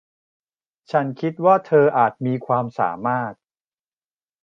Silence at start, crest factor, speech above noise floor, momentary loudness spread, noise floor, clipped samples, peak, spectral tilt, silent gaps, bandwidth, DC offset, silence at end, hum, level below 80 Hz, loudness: 0.95 s; 18 dB; over 71 dB; 10 LU; under -90 dBFS; under 0.1%; -2 dBFS; -9 dB/octave; none; 6.6 kHz; under 0.1%; 1.1 s; none; -70 dBFS; -20 LUFS